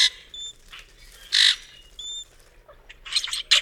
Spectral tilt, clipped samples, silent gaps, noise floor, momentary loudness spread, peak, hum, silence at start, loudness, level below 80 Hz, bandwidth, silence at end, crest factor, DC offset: 3.5 dB/octave; under 0.1%; none; -52 dBFS; 26 LU; -2 dBFS; none; 0 s; -21 LUFS; -54 dBFS; 17.5 kHz; 0 s; 24 dB; under 0.1%